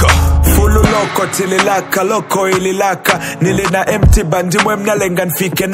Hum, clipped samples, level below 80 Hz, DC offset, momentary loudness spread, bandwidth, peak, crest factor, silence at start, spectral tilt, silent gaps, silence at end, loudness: none; 0.2%; -18 dBFS; under 0.1%; 4 LU; 16.5 kHz; 0 dBFS; 12 dB; 0 s; -5 dB/octave; none; 0 s; -13 LUFS